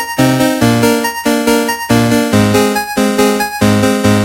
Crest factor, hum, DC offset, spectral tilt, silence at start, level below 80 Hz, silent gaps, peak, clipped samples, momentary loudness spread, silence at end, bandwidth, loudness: 12 dB; none; under 0.1%; -5 dB/octave; 0 s; -38 dBFS; none; 0 dBFS; under 0.1%; 3 LU; 0 s; 16.5 kHz; -11 LUFS